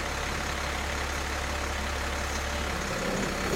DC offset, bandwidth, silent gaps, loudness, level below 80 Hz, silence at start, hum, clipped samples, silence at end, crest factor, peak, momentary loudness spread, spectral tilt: under 0.1%; 16 kHz; none; -31 LUFS; -36 dBFS; 0 s; none; under 0.1%; 0 s; 14 dB; -18 dBFS; 1 LU; -3.5 dB/octave